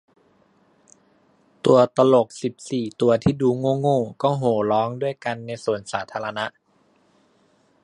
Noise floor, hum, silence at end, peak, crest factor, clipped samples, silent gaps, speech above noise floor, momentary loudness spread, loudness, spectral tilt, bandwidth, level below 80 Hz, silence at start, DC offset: -62 dBFS; none; 1.35 s; -2 dBFS; 20 dB; under 0.1%; none; 41 dB; 12 LU; -22 LUFS; -6.5 dB/octave; 11 kHz; -54 dBFS; 1.65 s; under 0.1%